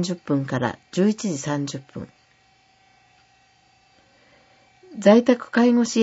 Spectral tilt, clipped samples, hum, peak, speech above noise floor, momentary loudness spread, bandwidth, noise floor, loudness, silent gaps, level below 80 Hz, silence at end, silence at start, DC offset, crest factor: -5.5 dB/octave; under 0.1%; none; -2 dBFS; 39 dB; 22 LU; 8 kHz; -59 dBFS; -21 LUFS; none; -66 dBFS; 0 s; 0 s; under 0.1%; 20 dB